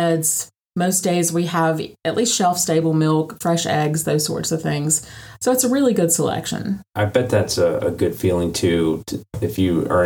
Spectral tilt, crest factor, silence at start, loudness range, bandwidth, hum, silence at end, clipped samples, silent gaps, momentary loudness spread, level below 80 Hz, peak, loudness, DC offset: -4.5 dB/octave; 16 dB; 0 s; 1 LU; 19.5 kHz; none; 0 s; under 0.1%; none; 7 LU; -48 dBFS; -4 dBFS; -19 LUFS; under 0.1%